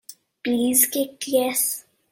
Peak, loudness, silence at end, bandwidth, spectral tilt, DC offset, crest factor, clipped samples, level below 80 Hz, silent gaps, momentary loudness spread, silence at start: -4 dBFS; -21 LUFS; 0.3 s; 16.5 kHz; -1.5 dB/octave; under 0.1%; 20 dB; under 0.1%; -68 dBFS; none; 11 LU; 0.1 s